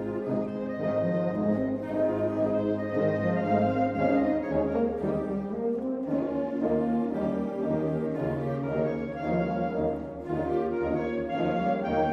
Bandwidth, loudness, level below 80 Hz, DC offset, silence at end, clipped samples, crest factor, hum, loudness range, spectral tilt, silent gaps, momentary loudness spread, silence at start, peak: 7.2 kHz; -28 LUFS; -52 dBFS; under 0.1%; 0 s; under 0.1%; 16 dB; none; 3 LU; -9.5 dB/octave; none; 5 LU; 0 s; -12 dBFS